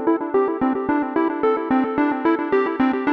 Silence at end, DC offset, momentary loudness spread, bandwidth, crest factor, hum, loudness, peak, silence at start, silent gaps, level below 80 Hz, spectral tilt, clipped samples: 0 s; under 0.1%; 2 LU; 5.2 kHz; 14 dB; none; -20 LUFS; -6 dBFS; 0 s; none; -56 dBFS; -8 dB/octave; under 0.1%